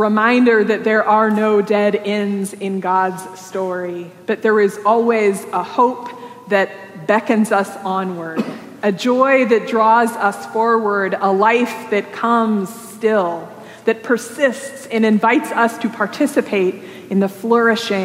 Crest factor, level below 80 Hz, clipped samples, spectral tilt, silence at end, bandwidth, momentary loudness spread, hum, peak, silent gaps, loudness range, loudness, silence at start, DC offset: 16 dB; -78 dBFS; under 0.1%; -5.5 dB/octave; 0 s; 16 kHz; 10 LU; none; -2 dBFS; none; 4 LU; -16 LUFS; 0 s; under 0.1%